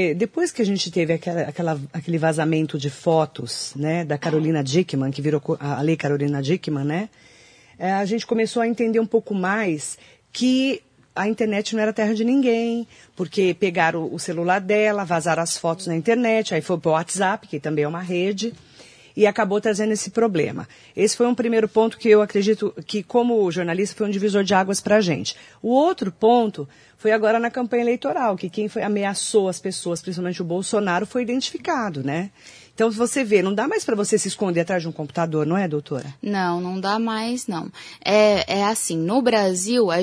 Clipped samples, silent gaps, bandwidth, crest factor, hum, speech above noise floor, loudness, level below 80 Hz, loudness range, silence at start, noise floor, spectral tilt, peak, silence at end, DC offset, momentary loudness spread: under 0.1%; none; 11 kHz; 18 dB; none; 27 dB; -22 LUFS; -64 dBFS; 3 LU; 0 s; -48 dBFS; -5 dB/octave; -2 dBFS; 0 s; under 0.1%; 8 LU